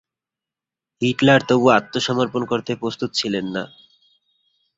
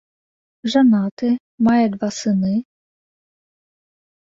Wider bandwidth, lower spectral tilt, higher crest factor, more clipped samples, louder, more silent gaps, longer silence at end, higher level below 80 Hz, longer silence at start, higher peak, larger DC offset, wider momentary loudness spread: about the same, 7.8 kHz vs 7.8 kHz; about the same, -5 dB/octave vs -6 dB/octave; about the same, 20 dB vs 16 dB; neither; about the same, -19 LUFS vs -18 LUFS; second, none vs 1.11-1.17 s, 1.40-1.58 s; second, 1.1 s vs 1.6 s; about the same, -58 dBFS vs -60 dBFS; first, 1 s vs 0.65 s; about the same, -2 dBFS vs -4 dBFS; neither; first, 11 LU vs 8 LU